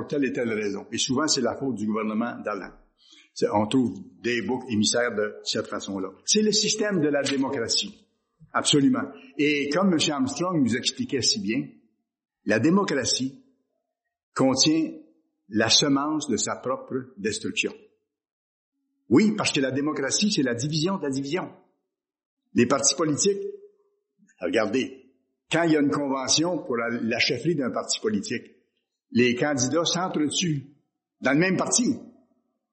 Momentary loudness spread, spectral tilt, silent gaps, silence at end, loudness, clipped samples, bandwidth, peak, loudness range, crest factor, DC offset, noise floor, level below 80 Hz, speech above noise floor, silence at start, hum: 11 LU; -3.5 dB/octave; 14.23-14.32 s, 18.32-18.72 s, 22.26-22.37 s; 0.6 s; -24 LUFS; under 0.1%; 8.8 kHz; -6 dBFS; 3 LU; 20 dB; under 0.1%; -81 dBFS; -66 dBFS; 56 dB; 0 s; none